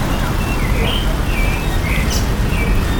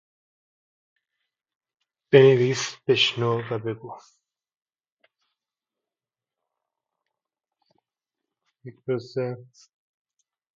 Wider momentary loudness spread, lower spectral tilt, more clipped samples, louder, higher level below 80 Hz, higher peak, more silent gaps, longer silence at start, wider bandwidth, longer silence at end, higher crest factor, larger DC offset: second, 2 LU vs 21 LU; about the same, -5 dB/octave vs -5 dB/octave; neither; first, -18 LUFS vs -22 LUFS; first, -18 dBFS vs -72 dBFS; about the same, -4 dBFS vs -2 dBFS; second, none vs 4.57-4.61 s, 4.92-4.97 s; second, 0 s vs 2.1 s; first, 19 kHz vs 7.6 kHz; second, 0 s vs 1.15 s; second, 12 dB vs 26 dB; neither